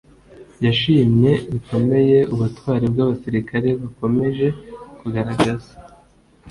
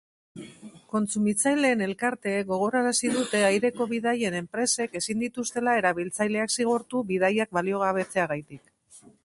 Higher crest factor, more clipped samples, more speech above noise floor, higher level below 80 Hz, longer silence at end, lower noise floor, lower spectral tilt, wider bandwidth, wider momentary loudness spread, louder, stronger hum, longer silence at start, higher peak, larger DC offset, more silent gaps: about the same, 16 dB vs 18 dB; neither; first, 34 dB vs 29 dB; first, -46 dBFS vs -68 dBFS; second, 0 s vs 0.15 s; about the same, -52 dBFS vs -54 dBFS; first, -8 dB/octave vs -3.5 dB/octave; about the same, 11.5 kHz vs 11.5 kHz; first, 10 LU vs 6 LU; first, -19 LUFS vs -26 LUFS; neither; about the same, 0.4 s vs 0.35 s; first, -2 dBFS vs -10 dBFS; neither; neither